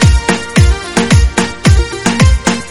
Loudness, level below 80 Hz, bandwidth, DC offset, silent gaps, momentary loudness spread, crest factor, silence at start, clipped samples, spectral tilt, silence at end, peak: -11 LUFS; -14 dBFS; 12 kHz; under 0.1%; none; 4 LU; 10 dB; 0 s; 0.5%; -5 dB/octave; 0 s; 0 dBFS